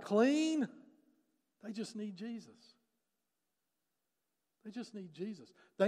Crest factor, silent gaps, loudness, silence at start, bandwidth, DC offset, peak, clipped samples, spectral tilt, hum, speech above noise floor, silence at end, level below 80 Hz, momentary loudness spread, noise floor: 22 dB; none; -38 LUFS; 0 s; 12 kHz; under 0.1%; -18 dBFS; under 0.1%; -5.5 dB/octave; none; 52 dB; 0 s; under -90 dBFS; 22 LU; -88 dBFS